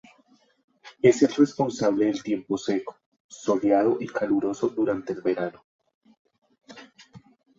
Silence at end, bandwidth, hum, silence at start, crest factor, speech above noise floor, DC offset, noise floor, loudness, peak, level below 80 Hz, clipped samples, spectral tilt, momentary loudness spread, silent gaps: 0.4 s; 7.8 kHz; none; 0.85 s; 20 dB; 38 dB; under 0.1%; -62 dBFS; -24 LUFS; -6 dBFS; -68 dBFS; under 0.1%; -6 dB/octave; 9 LU; 3.06-3.12 s, 3.20-3.29 s, 5.64-5.79 s, 5.94-6.01 s, 6.19-6.25 s